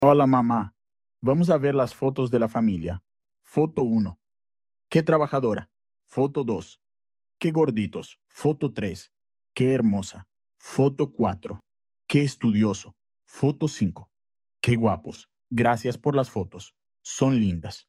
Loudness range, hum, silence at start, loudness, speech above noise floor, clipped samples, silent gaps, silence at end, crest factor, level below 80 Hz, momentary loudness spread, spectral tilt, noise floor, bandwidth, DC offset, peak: 3 LU; none; 0 s; -25 LUFS; over 66 dB; under 0.1%; none; 0.1 s; 22 dB; -56 dBFS; 15 LU; -7 dB/octave; under -90 dBFS; 13 kHz; under 0.1%; -4 dBFS